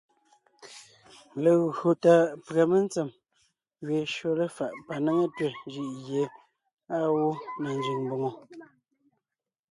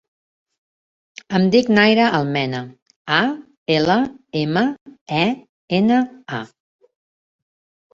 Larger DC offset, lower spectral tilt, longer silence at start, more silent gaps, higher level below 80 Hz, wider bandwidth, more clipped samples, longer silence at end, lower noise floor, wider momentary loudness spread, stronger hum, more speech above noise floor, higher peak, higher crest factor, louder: neither; about the same, -6.5 dB/octave vs -6.5 dB/octave; second, 0.6 s vs 1.3 s; second, 6.73-6.77 s vs 2.82-2.86 s, 2.96-3.05 s, 3.57-3.66 s, 4.81-4.86 s, 5.01-5.06 s, 5.49-5.68 s; second, -74 dBFS vs -58 dBFS; first, 11.5 kHz vs 7.6 kHz; neither; second, 1.1 s vs 1.45 s; about the same, -90 dBFS vs under -90 dBFS; about the same, 14 LU vs 16 LU; neither; second, 63 dB vs over 72 dB; second, -8 dBFS vs -2 dBFS; about the same, 22 dB vs 18 dB; second, -27 LUFS vs -18 LUFS